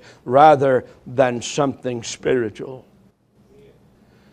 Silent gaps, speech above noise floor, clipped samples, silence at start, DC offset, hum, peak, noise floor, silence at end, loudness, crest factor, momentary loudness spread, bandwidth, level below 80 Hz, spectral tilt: none; 37 dB; under 0.1%; 0.25 s; under 0.1%; none; 0 dBFS; -55 dBFS; 1.5 s; -18 LUFS; 20 dB; 16 LU; 10.5 kHz; -58 dBFS; -5 dB/octave